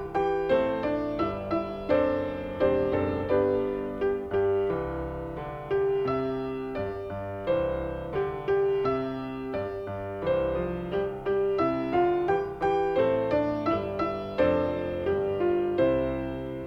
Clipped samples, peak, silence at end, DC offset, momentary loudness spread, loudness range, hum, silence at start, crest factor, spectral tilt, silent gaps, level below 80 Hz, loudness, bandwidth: under 0.1%; -10 dBFS; 0 s; under 0.1%; 8 LU; 3 LU; none; 0 s; 16 dB; -8.5 dB/octave; none; -48 dBFS; -28 LUFS; 6 kHz